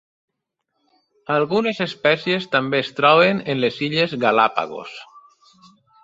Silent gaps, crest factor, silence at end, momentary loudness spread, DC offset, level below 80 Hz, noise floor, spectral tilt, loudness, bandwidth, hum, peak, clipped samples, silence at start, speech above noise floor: none; 20 dB; 0.85 s; 14 LU; under 0.1%; -66 dBFS; -77 dBFS; -6 dB/octave; -19 LUFS; 7.8 kHz; none; 0 dBFS; under 0.1%; 1.3 s; 58 dB